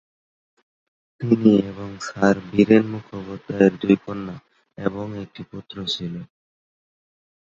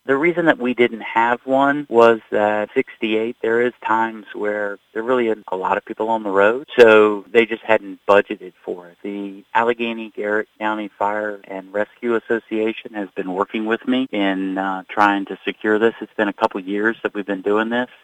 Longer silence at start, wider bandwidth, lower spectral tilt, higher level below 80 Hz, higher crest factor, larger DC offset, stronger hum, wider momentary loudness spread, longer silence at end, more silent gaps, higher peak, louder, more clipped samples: first, 1.2 s vs 0.05 s; second, 7.6 kHz vs 9 kHz; about the same, -7 dB/octave vs -6 dB/octave; first, -56 dBFS vs -64 dBFS; about the same, 20 dB vs 18 dB; neither; neither; first, 19 LU vs 11 LU; first, 1.2 s vs 0.2 s; neither; about the same, -2 dBFS vs 0 dBFS; about the same, -20 LUFS vs -19 LUFS; neither